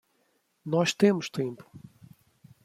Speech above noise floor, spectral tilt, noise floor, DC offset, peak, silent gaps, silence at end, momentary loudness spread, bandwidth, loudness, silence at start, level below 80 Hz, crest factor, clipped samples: 45 dB; -5.5 dB/octave; -72 dBFS; under 0.1%; -8 dBFS; none; 0.85 s; 20 LU; 14.5 kHz; -27 LUFS; 0.65 s; -72 dBFS; 22 dB; under 0.1%